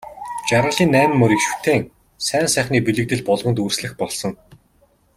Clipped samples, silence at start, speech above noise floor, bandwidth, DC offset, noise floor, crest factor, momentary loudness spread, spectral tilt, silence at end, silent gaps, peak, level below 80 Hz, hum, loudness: under 0.1%; 0.05 s; 40 dB; 16 kHz; under 0.1%; -58 dBFS; 18 dB; 11 LU; -4.5 dB/octave; 0.85 s; none; -2 dBFS; -50 dBFS; none; -18 LUFS